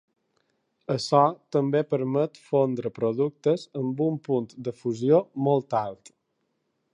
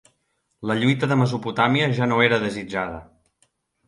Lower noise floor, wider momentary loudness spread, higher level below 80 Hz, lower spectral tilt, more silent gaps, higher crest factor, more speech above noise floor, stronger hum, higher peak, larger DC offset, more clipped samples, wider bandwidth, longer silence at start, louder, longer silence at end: first, -76 dBFS vs -72 dBFS; about the same, 9 LU vs 11 LU; second, -74 dBFS vs -56 dBFS; about the same, -7.5 dB/octave vs -6.5 dB/octave; neither; about the same, 20 dB vs 20 dB; about the same, 51 dB vs 51 dB; neither; second, -6 dBFS vs -2 dBFS; neither; neither; about the same, 10.5 kHz vs 11.5 kHz; first, 0.9 s vs 0.6 s; second, -26 LUFS vs -21 LUFS; first, 1 s vs 0.85 s